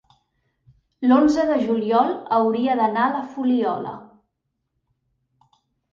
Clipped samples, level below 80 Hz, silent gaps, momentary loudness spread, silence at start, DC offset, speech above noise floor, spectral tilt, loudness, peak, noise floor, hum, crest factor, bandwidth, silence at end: under 0.1%; -60 dBFS; none; 9 LU; 1 s; under 0.1%; 57 dB; -6.5 dB/octave; -20 LUFS; -4 dBFS; -77 dBFS; none; 18 dB; 7.2 kHz; 1.85 s